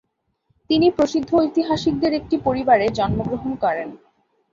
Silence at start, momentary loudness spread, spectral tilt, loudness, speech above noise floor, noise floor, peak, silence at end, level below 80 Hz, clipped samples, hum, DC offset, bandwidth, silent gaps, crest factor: 0.7 s; 7 LU; -6.5 dB/octave; -20 LUFS; 49 dB; -68 dBFS; -4 dBFS; 0.55 s; -44 dBFS; under 0.1%; none; under 0.1%; 7.6 kHz; none; 16 dB